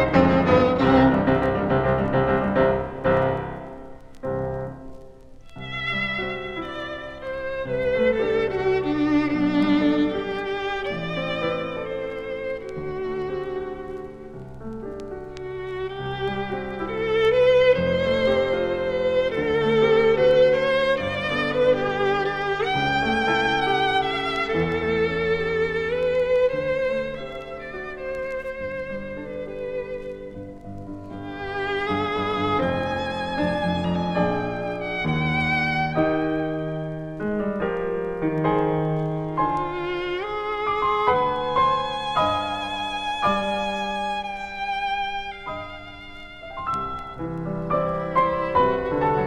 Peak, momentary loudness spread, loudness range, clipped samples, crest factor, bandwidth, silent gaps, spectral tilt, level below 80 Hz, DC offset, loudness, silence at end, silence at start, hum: -4 dBFS; 15 LU; 10 LU; under 0.1%; 20 dB; 9.8 kHz; none; -7 dB/octave; -44 dBFS; under 0.1%; -23 LUFS; 0 s; 0 s; none